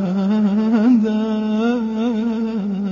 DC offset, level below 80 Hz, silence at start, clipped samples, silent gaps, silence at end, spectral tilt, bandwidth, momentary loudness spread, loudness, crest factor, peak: under 0.1%; -54 dBFS; 0 s; under 0.1%; none; 0 s; -8.5 dB/octave; 7 kHz; 7 LU; -18 LUFS; 12 dB; -6 dBFS